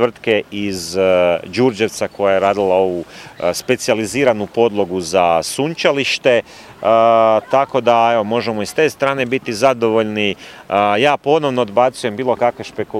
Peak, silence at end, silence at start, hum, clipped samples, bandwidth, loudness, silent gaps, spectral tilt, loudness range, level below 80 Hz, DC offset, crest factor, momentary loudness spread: 0 dBFS; 0 s; 0 s; none; under 0.1%; 15 kHz; -16 LUFS; none; -4.5 dB/octave; 2 LU; -54 dBFS; under 0.1%; 16 dB; 7 LU